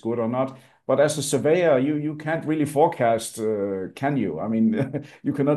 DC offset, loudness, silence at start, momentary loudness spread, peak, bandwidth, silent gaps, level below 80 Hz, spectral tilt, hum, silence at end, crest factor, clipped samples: under 0.1%; -23 LUFS; 0.05 s; 9 LU; -6 dBFS; 12.5 kHz; none; -68 dBFS; -6 dB/octave; none; 0 s; 18 dB; under 0.1%